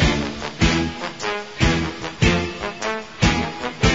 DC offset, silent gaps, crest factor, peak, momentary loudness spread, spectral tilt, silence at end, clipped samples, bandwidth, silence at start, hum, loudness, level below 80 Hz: 0.4%; none; 18 dB; -4 dBFS; 8 LU; -5 dB/octave; 0 s; under 0.1%; 7.8 kHz; 0 s; none; -22 LUFS; -30 dBFS